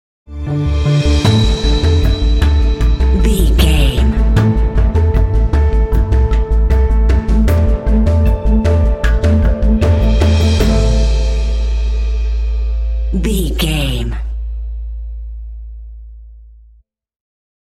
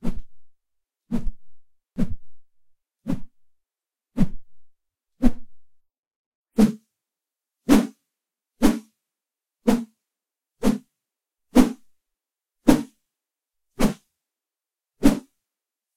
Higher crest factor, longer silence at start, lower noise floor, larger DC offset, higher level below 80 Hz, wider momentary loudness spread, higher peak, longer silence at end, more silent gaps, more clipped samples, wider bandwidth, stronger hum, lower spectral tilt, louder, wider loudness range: second, 12 dB vs 24 dB; first, 0.3 s vs 0.05 s; second, -48 dBFS vs under -90 dBFS; neither; first, -14 dBFS vs -36 dBFS; second, 12 LU vs 20 LU; about the same, 0 dBFS vs 0 dBFS; first, 1.35 s vs 0.8 s; second, none vs 5.99-6.44 s; neither; second, 13 kHz vs 16.5 kHz; neither; about the same, -6.5 dB/octave vs -6 dB/octave; first, -14 LUFS vs -24 LUFS; about the same, 8 LU vs 10 LU